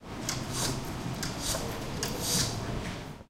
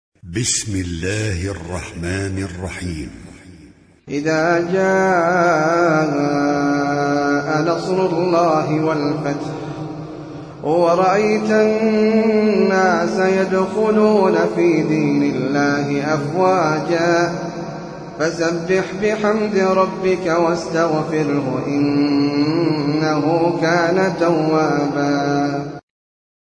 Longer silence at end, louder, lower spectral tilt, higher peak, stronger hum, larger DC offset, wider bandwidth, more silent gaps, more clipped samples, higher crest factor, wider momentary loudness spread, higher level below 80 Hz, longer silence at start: second, 0.05 s vs 0.6 s; second, -32 LUFS vs -17 LUFS; second, -3 dB/octave vs -5.5 dB/octave; second, -14 dBFS vs -2 dBFS; neither; neither; first, 17 kHz vs 10.5 kHz; neither; neither; first, 20 dB vs 14 dB; second, 8 LU vs 12 LU; about the same, -44 dBFS vs -48 dBFS; second, 0 s vs 0.25 s